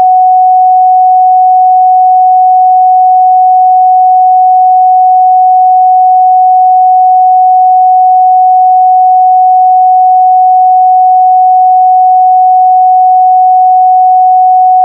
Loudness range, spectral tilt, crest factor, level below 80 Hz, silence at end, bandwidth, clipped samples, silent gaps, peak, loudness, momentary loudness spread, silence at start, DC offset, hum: 0 LU; -5 dB/octave; 4 dB; under -90 dBFS; 0 s; 0.8 kHz; under 0.1%; none; 0 dBFS; -4 LUFS; 0 LU; 0 s; under 0.1%; none